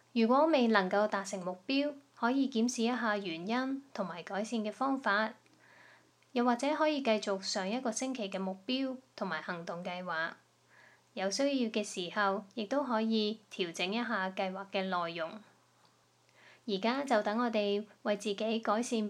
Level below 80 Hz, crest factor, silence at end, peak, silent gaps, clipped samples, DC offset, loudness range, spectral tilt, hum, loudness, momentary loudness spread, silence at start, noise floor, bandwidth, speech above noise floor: under -90 dBFS; 22 dB; 0 s; -12 dBFS; none; under 0.1%; under 0.1%; 4 LU; -4 dB/octave; none; -33 LUFS; 9 LU; 0.15 s; -68 dBFS; 11.5 kHz; 35 dB